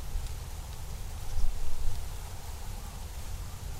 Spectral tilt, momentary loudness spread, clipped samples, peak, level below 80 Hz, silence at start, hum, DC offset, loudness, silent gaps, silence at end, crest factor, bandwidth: -4 dB/octave; 4 LU; under 0.1%; -12 dBFS; -34 dBFS; 0 s; none; under 0.1%; -41 LUFS; none; 0 s; 16 dB; 15.5 kHz